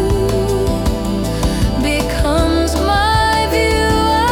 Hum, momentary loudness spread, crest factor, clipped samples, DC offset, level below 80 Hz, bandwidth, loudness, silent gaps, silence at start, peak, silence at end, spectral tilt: none; 5 LU; 10 dB; under 0.1%; under 0.1%; -22 dBFS; 18 kHz; -15 LUFS; none; 0 s; -4 dBFS; 0 s; -5 dB/octave